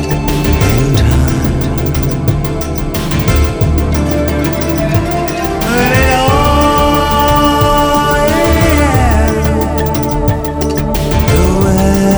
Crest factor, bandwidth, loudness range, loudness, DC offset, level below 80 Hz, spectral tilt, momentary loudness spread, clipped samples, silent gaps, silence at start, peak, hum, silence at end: 10 dB; over 20 kHz; 4 LU; -12 LUFS; under 0.1%; -18 dBFS; -6 dB/octave; 5 LU; under 0.1%; none; 0 s; 0 dBFS; none; 0 s